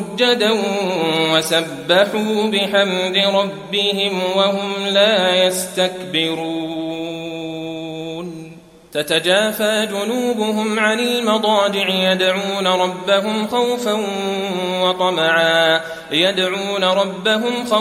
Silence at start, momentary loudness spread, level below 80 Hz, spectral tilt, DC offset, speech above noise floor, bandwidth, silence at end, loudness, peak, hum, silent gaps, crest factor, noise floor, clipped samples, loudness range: 0 s; 10 LU; -62 dBFS; -3.5 dB/octave; under 0.1%; 22 dB; 16 kHz; 0 s; -17 LUFS; 0 dBFS; none; none; 16 dB; -39 dBFS; under 0.1%; 4 LU